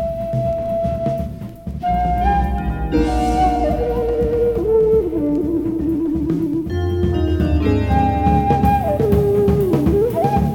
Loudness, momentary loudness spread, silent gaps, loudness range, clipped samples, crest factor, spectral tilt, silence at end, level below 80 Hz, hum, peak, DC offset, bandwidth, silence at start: -18 LUFS; 6 LU; none; 3 LU; under 0.1%; 16 dB; -8.5 dB/octave; 0 s; -26 dBFS; none; -2 dBFS; under 0.1%; 17.5 kHz; 0 s